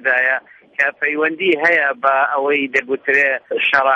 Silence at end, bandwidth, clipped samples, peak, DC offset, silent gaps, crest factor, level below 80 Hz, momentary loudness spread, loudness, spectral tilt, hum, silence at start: 0 s; 8.6 kHz; under 0.1%; -2 dBFS; under 0.1%; none; 16 dB; -66 dBFS; 5 LU; -16 LUFS; -4 dB/octave; none; 0 s